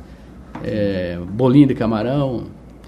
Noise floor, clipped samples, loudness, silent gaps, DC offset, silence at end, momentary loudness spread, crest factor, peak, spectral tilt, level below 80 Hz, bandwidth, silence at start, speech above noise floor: -39 dBFS; under 0.1%; -18 LUFS; none; under 0.1%; 0 s; 17 LU; 18 dB; 0 dBFS; -9 dB/octave; -42 dBFS; 5.6 kHz; 0 s; 22 dB